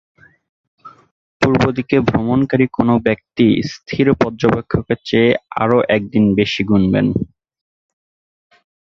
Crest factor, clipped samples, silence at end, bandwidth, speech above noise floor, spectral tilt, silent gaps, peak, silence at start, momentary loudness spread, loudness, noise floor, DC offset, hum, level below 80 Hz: 16 dB; under 0.1%; 1.65 s; 7.4 kHz; over 75 dB; -7.5 dB/octave; 1.11-1.40 s; 0 dBFS; 0.85 s; 5 LU; -16 LUFS; under -90 dBFS; under 0.1%; none; -42 dBFS